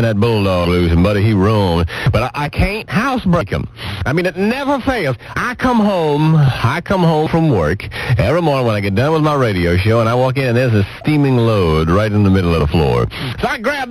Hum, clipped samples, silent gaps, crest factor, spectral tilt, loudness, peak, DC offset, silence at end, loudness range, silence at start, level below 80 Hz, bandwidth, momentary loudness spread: none; under 0.1%; none; 12 dB; -7.5 dB/octave; -15 LUFS; -2 dBFS; under 0.1%; 0 s; 3 LU; 0 s; -30 dBFS; 14 kHz; 5 LU